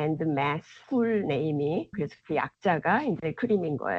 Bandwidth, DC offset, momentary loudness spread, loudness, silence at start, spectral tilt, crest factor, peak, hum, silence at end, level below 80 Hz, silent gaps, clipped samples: 7.4 kHz; under 0.1%; 5 LU; -28 LUFS; 0 s; -8.5 dB/octave; 16 dB; -12 dBFS; none; 0 s; -64 dBFS; none; under 0.1%